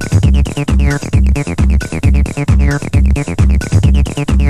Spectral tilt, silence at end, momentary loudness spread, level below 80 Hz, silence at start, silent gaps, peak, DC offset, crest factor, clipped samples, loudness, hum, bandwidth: -6.5 dB/octave; 0 s; 2 LU; -12 dBFS; 0 s; none; 0 dBFS; under 0.1%; 10 dB; under 0.1%; -13 LUFS; none; 11.5 kHz